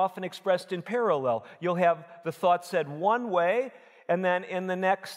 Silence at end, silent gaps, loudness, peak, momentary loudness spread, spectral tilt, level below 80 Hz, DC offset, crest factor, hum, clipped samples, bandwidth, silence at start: 0 s; none; -28 LUFS; -10 dBFS; 7 LU; -6 dB/octave; -88 dBFS; under 0.1%; 18 dB; none; under 0.1%; 16 kHz; 0 s